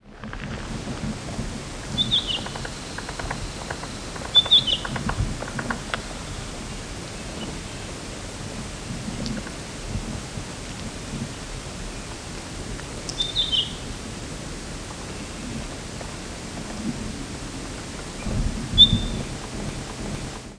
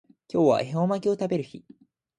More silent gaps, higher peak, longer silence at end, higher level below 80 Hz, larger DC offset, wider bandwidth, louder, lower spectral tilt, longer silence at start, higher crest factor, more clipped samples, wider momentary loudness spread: neither; first, -2 dBFS vs -8 dBFS; second, 0 s vs 0.6 s; first, -38 dBFS vs -68 dBFS; neither; about the same, 11 kHz vs 10 kHz; about the same, -26 LUFS vs -25 LUFS; second, -3.5 dB/octave vs -7.5 dB/octave; second, 0.05 s vs 0.35 s; first, 26 dB vs 18 dB; neither; first, 13 LU vs 9 LU